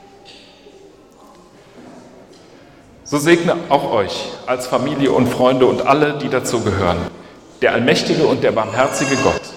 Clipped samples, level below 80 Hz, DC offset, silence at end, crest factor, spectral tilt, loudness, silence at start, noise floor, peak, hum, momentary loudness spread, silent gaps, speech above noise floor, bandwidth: under 0.1%; -48 dBFS; under 0.1%; 0 s; 18 dB; -5 dB/octave; -16 LUFS; 0.3 s; -44 dBFS; 0 dBFS; none; 8 LU; none; 29 dB; 16.5 kHz